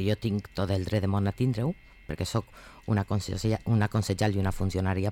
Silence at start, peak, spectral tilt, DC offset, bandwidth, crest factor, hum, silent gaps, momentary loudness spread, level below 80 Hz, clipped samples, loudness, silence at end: 0 s; -16 dBFS; -6.5 dB/octave; under 0.1%; 15.5 kHz; 12 dB; none; none; 7 LU; -46 dBFS; under 0.1%; -29 LUFS; 0 s